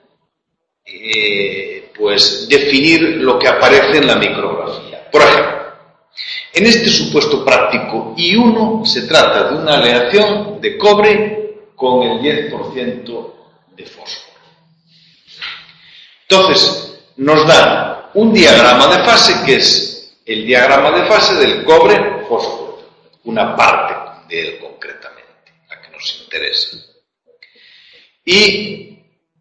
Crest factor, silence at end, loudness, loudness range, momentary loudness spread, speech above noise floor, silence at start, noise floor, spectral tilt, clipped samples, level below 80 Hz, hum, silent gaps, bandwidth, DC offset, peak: 12 dB; 0.6 s; -10 LUFS; 13 LU; 19 LU; 62 dB; 0.9 s; -73 dBFS; -3.5 dB/octave; 0.3%; -48 dBFS; none; none; 11 kHz; under 0.1%; 0 dBFS